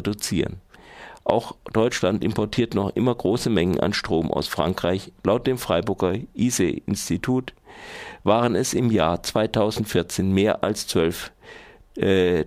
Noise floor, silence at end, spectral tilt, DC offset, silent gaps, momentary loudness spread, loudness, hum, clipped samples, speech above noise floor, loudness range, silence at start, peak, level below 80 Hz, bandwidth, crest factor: -44 dBFS; 0 s; -5 dB/octave; under 0.1%; none; 9 LU; -23 LUFS; none; under 0.1%; 22 dB; 2 LU; 0 s; -2 dBFS; -48 dBFS; 16 kHz; 20 dB